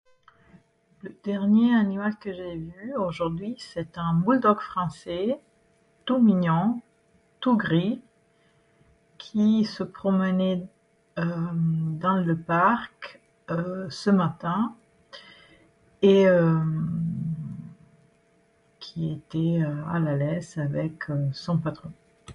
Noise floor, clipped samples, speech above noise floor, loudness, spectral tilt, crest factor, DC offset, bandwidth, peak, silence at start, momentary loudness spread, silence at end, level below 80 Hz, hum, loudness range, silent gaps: -64 dBFS; under 0.1%; 39 dB; -25 LUFS; -8 dB/octave; 20 dB; under 0.1%; 10 kHz; -6 dBFS; 1.05 s; 16 LU; 0 s; -60 dBFS; none; 5 LU; none